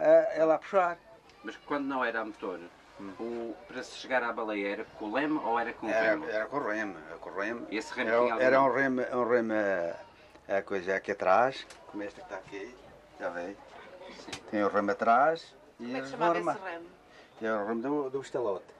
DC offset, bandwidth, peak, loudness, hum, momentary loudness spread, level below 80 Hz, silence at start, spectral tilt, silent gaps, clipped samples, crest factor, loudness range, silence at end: under 0.1%; 11 kHz; -12 dBFS; -30 LUFS; none; 18 LU; -70 dBFS; 0 s; -5.5 dB/octave; none; under 0.1%; 20 dB; 6 LU; 0.1 s